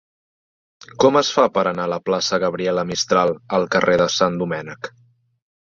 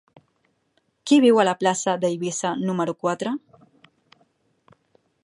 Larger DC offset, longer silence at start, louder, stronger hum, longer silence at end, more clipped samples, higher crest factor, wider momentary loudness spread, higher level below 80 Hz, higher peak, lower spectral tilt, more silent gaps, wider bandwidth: neither; about the same, 1 s vs 1.05 s; about the same, -19 LUFS vs -21 LUFS; neither; second, 0.85 s vs 1.85 s; neither; about the same, 18 dB vs 20 dB; second, 9 LU vs 12 LU; first, -58 dBFS vs -74 dBFS; about the same, -2 dBFS vs -4 dBFS; about the same, -4 dB/octave vs -4.5 dB/octave; neither; second, 7.6 kHz vs 11.5 kHz